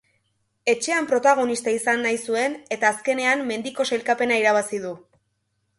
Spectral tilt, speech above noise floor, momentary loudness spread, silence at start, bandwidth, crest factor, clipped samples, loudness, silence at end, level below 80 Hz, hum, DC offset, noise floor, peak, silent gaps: -2.5 dB/octave; 51 dB; 9 LU; 0.65 s; 11.5 kHz; 18 dB; under 0.1%; -22 LUFS; 0.8 s; -72 dBFS; none; under 0.1%; -73 dBFS; -6 dBFS; none